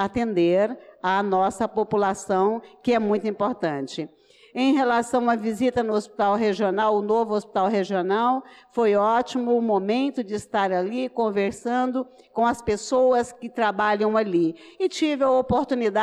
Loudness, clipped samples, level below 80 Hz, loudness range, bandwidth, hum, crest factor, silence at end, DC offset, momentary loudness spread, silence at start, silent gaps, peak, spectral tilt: -23 LUFS; under 0.1%; -56 dBFS; 2 LU; 12 kHz; none; 10 dB; 0 s; under 0.1%; 7 LU; 0 s; none; -12 dBFS; -5.5 dB/octave